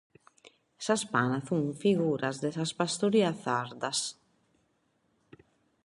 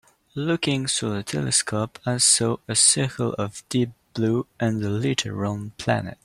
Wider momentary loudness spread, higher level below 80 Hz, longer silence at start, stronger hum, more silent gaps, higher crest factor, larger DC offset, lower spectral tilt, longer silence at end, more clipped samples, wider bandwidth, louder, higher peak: second, 6 LU vs 11 LU; second, -72 dBFS vs -56 dBFS; first, 0.8 s vs 0.35 s; neither; neither; about the same, 20 dB vs 20 dB; neither; about the same, -4.5 dB/octave vs -3.5 dB/octave; first, 1.75 s vs 0.1 s; neither; second, 11.5 kHz vs 14.5 kHz; second, -30 LUFS vs -22 LUFS; second, -12 dBFS vs -2 dBFS